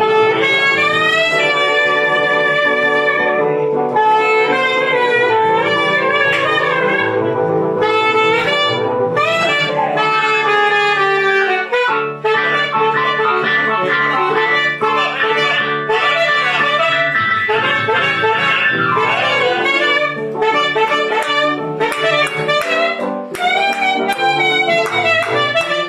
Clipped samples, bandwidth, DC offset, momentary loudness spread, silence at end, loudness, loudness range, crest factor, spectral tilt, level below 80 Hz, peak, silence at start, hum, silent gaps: under 0.1%; 13.5 kHz; under 0.1%; 3 LU; 0 s; -14 LUFS; 2 LU; 12 dB; -4 dB/octave; -62 dBFS; -4 dBFS; 0 s; none; none